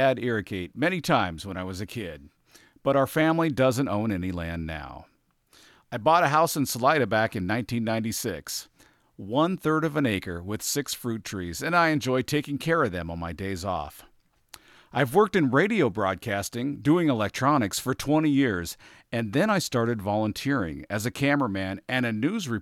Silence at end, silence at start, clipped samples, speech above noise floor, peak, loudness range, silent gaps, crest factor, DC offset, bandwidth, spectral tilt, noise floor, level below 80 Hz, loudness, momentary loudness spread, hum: 0 s; 0 s; under 0.1%; 36 dB; -6 dBFS; 3 LU; none; 20 dB; under 0.1%; 16.5 kHz; -5 dB/octave; -62 dBFS; -54 dBFS; -26 LUFS; 12 LU; none